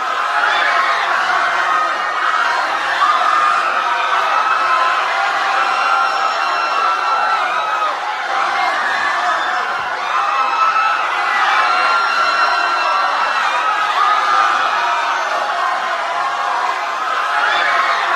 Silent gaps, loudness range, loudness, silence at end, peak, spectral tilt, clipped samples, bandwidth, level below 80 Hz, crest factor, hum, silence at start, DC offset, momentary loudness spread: none; 2 LU; -15 LUFS; 0 s; -2 dBFS; 0 dB/octave; under 0.1%; 13 kHz; -66 dBFS; 14 dB; none; 0 s; under 0.1%; 5 LU